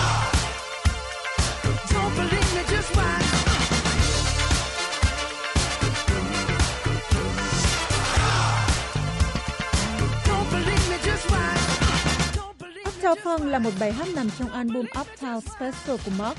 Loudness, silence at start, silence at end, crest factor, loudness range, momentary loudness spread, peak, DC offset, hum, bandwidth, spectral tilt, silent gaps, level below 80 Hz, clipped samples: -24 LUFS; 0 s; 0 s; 14 dB; 3 LU; 7 LU; -10 dBFS; under 0.1%; none; 11.5 kHz; -4 dB/octave; none; -30 dBFS; under 0.1%